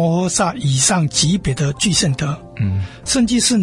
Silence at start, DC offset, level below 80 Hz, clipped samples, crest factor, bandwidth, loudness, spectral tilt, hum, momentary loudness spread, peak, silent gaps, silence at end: 0 s; under 0.1%; -40 dBFS; under 0.1%; 16 dB; 11.5 kHz; -17 LUFS; -4 dB/octave; none; 8 LU; -2 dBFS; none; 0 s